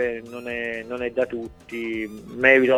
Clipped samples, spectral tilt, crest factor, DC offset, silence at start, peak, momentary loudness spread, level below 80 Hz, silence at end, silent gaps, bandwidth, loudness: under 0.1%; -5.5 dB/octave; 22 dB; under 0.1%; 0 s; 0 dBFS; 16 LU; -54 dBFS; 0 s; none; 13.5 kHz; -24 LUFS